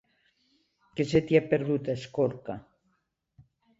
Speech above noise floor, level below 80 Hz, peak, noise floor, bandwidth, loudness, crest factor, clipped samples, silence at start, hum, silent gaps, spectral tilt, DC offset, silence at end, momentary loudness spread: 49 dB; -58 dBFS; -8 dBFS; -76 dBFS; 8 kHz; -28 LUFS; 22 dB; under 0.1%; 0.95 s; none; none; -7 dB/octave; under 0.1%; 1.2 s; 17 LU